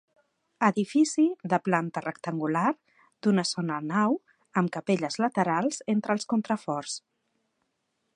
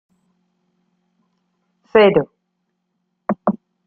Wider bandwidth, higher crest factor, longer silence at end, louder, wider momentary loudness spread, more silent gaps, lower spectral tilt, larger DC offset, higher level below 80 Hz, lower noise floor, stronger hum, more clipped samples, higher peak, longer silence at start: first, 10.5 kHz vs 4.7 kHz; about the same, 22 dB vs 20 dB; first, 1.2 s vs 0.35 s; second, -27 LUFS vs -17 LUFS; second, 8 LU vs 17 LU; neither; second, -5.5 dB/octave vs -9 dB/octave; neither; second, -78 dBFS vs -56 dBFS; first, -78 dBFS vs -73 dBFS; neither; neither; second, -6 dBFS vs -2 dBFS; second, 0.6 s vs 1.95 s